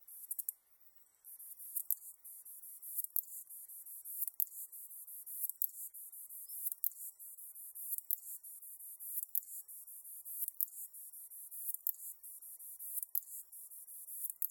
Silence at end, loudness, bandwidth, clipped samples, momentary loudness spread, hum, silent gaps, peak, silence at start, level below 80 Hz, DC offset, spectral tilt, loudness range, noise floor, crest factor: 0 s; -41 LUFS; 17.5 kHz; under 0.1%; 13 LU; none; none; -10 dBFS; 0 s; under -90 dBFS; under 0.1%; 4 dB/octave; 2 LU; -65 dBFS; 34 dB